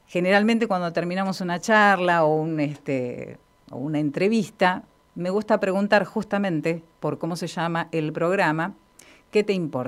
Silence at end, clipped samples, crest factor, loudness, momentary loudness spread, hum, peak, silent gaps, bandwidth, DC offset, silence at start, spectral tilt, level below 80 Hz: 0 s; under 0.1%; 20 dB; -23 LUFS; 11 LU; none; -4 dBFS; none; 14.5 kHz; under 0.1%; 0.1 s; -6 dB/octave; -66 dBFS